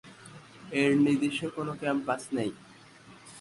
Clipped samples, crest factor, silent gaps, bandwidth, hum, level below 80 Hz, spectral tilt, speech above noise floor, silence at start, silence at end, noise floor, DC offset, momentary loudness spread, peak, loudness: under 0.1%; 18 dB; none; 11.5 kHz; none; -70 dBFS; -5.5 dB/octave; 25 dB; 0.05 s; 0 s; -53 dBFS; under 0.1%; 25 LU; -12 dBFS; -29 LUFS